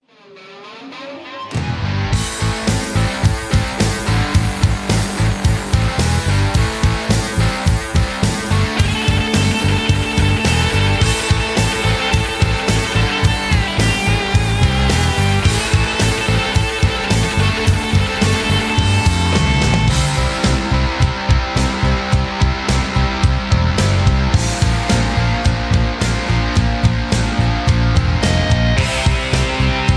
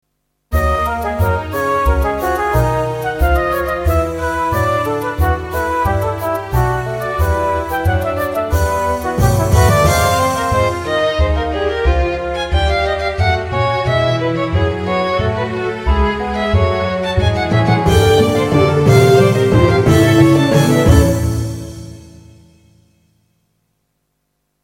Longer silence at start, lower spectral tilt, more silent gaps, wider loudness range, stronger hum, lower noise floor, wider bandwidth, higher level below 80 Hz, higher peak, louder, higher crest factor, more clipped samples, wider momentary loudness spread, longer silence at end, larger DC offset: second, 0.3 s vs 0.5 s; about the same, -5 dB/octave vs -6 dB/octave; neither; second, 2 LU vs 6 LU; neither; second, -42 dBFS vs -69 dBFS; second, 11 kHz vs 17 kHz; about the same, -22 dBFS vs -24 dBFS; about the same, -2 dBFS vs 0 dBFS; about the same, -16 LUFS vs -15 LUFS; about the same, 14 dB vs 14 dB; neither; second, 3 LU vs 8 LU; second, 0 s vs 2.45 s; neither